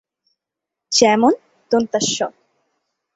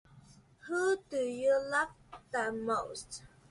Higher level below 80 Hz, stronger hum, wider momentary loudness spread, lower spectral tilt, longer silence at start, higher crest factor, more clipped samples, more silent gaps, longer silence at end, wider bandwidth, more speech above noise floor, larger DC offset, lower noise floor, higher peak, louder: about the same, -62 dBFS vs -66 dBFS; neither; second, 11 LU vs 17 LU; about the same, -2.5 dB/octave vs -3.5 dB/octave; first, 0.9 s vs 0.15 s; about the same, 20 dB vs 16 dB; neither; neither; first, 0.85 s vs 0.25 s; second, 8 kHz vs 11.5 kHz; first, 68 dB vs 24 dB; neither; first, -84 dBFS vs -59 dBFS; first, 0 dBFS vs -18 dBFS; first, -17 LUFS vs -34 LUFS